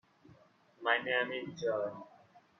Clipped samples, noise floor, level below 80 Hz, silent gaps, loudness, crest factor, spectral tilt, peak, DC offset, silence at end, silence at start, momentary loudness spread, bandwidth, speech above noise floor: under 0.1%; -64 dBFS; -82 dBFS; none; -34 LUFS; 24 dB; -4.5 dB/octave; -14 dBFS; under 0.1%; 0.2 s; 0.8 s; 10 LU; 6.6 kHz; 30 dB